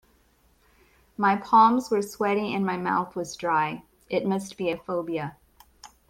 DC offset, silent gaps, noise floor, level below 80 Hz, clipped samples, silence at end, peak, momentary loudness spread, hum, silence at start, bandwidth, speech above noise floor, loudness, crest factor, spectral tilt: under 0.1%; none; -63 dBFS; -64 dBFS; under 0.1%; 0.25 s; -6 dBFS; 14 LU; none; 1.2 s; 16.5 kHz; 38 dB; -25 LUFS; 20 dB; -5.5 dB/octave